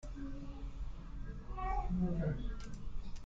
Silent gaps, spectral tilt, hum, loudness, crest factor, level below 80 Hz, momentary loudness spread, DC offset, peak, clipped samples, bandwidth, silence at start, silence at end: none; -8 dB/octave; none; -43 LUFS; 14 dB; -42 dBFS; 13 LU; under 0.1%; -24 dBFS; under 0.1%; 7.8 kHz; 0.05 s; 0 s